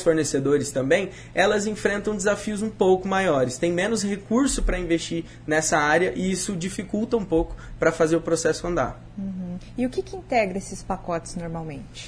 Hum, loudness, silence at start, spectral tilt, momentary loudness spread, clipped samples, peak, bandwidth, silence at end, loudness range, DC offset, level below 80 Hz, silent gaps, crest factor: none; -24 LUFS; 0 s; -4.5 dB/octave; 11 LU; under 0.1%; -6 dBFS; 11 kHz; 0 s; 4 LU; under 0.1%; -40 dBFS; none; 18 dB